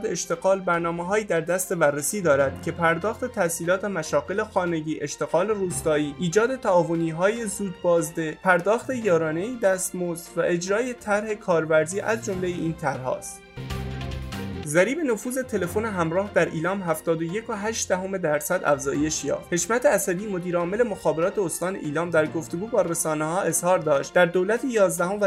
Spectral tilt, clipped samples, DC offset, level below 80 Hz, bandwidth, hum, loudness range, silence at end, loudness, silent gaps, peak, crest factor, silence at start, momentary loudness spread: -4.5 dB/octave; under 0.1%; under 0.1%; -50 dBFS; 16 kHz; none; 3 LU; 0 s; -24 LUFS; none; -4 dBFS; 20 dB; 0 s; 7 LU